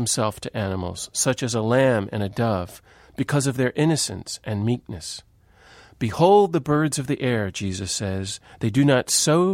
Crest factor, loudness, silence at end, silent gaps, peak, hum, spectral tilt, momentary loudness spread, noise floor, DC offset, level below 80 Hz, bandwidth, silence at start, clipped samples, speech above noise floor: 18 dB; -22 LUFS; 0 s; none; -4 dBFS; none; -4.5 dB/octave; 12 LU; -52 dBFS; under 0.1%; -54 dBFS; 16 kHz; 0 s; under 0.1%; 30 dB